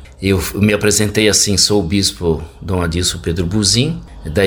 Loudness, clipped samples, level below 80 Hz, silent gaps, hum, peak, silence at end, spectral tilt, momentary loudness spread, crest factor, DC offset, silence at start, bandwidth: -14 LUFS; under 0.1%; -32 dBFS; none; none; 0 dBFS; 0 s; -3.5 dB/octave; 9 LU; 16 dB; under 0.1%; 0 s; over 20 kHz